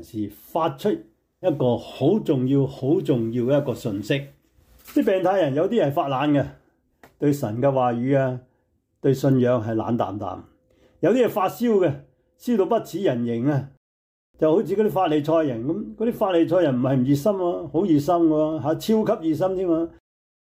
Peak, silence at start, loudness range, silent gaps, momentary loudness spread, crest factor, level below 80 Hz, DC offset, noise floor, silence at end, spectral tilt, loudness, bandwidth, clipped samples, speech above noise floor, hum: -8 dBFS; 0 s; 3 LU; 13.77-14.34 s; 8 LU; 14 dB; -58 dBFS; under 0.1%; -68 dBFS; 0.55 s; -7.5 dB/octave; -22 LUFS; 16 kHz; under 0.1%; 47 dB; none